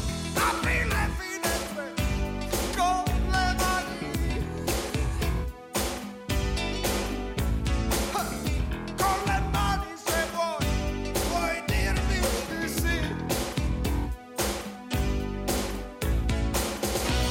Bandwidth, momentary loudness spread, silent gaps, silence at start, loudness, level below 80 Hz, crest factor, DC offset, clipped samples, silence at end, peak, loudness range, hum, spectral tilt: 17 kHz; 5 LU; none; 0 s; -28 LUFS; -32 dBFS; 14 dB; under 0.1%; under 0.1%; 0 s; -14 dBFS; 2 LU; none; -4.5 dB/octave